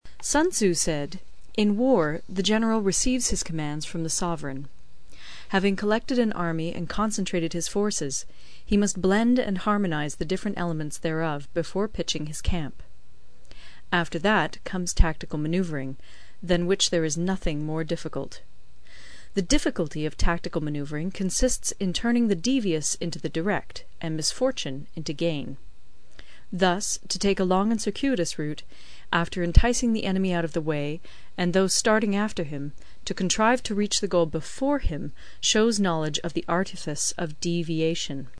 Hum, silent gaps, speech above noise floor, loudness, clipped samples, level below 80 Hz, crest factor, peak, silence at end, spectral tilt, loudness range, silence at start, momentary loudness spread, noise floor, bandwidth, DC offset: none; none; 26 dB; -26 LUFS; under 0.1%; -34 dBFS; 24 dB; 0 dBFS; 0.1 s; -4 dB/octave; 5 LU; 0 s; 11 LU; -51 dBFS; 11 kHz; 2%